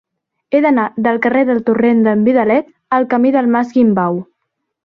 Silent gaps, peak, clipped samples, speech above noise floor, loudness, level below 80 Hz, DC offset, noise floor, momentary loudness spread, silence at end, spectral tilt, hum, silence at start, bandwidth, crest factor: none; -2 dBFS; under 0.1%; 60 dB; -14 LUFS; -58 dBFS; under 0.1%; -73 dBFS; 5 LU; 0.6 s; -9 dB/octave; none; 0.5 s; 6 kHz; 12 dB